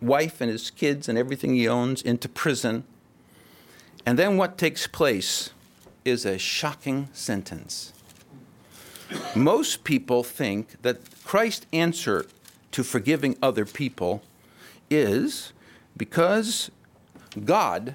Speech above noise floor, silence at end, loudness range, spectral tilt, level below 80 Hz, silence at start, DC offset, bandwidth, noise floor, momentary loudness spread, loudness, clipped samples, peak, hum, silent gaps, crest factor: 30 dB; 0 s; 3 LU; -4.5 dB/octave; -64 dBFS; 0 s; under 0.1%; 17 kHz; -55 dBFS; 12 LU; -25 LUFS; under 0.1%; -8 dBFS; none; none; 18 dB